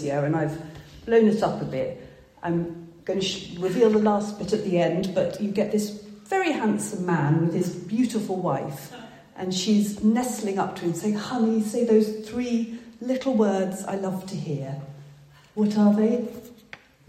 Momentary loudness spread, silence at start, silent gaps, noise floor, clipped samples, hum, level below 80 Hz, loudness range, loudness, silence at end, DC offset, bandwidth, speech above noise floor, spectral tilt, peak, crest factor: 15 LU; 0 s; none; -50 dBFS; under 0.1%; none; -60 dBFS; 2 LU; -25 LUFS; 0.35 s; under 0.1%; 14.5 kHz; 26 dB; -6 dB/octave; -8 dBFS; 18 dB